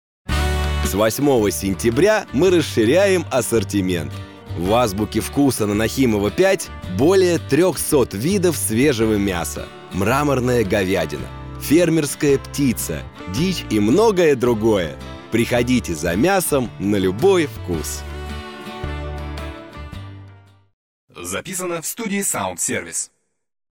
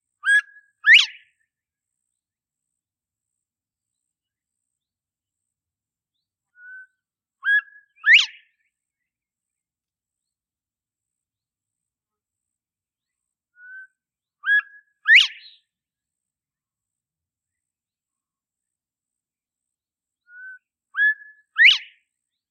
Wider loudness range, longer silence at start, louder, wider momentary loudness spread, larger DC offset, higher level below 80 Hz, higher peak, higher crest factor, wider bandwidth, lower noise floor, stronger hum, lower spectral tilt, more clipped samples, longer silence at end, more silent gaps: about the same, 9 LU vs 8 LU; about the same, 0.25 s vs 0.25 s; second, -19 LUFS vs -16 LUFS; about the same, 14 LU vs 15 LU; neither; first, -34 dBFS vs under -90 dBFS; about the same, -6 dBFS vs -4 dBFS; second, 14 dB vs 22 dB; first, 19.5 kHz vs 10 kHz; second, -45 dBFS vs under -90 dBFS; neither; first, -5 dB/octave vs 9.5 dB/octave; neither; about the same, 0.65 s vs 0.7 s; first, 20.73-21.08 s vs none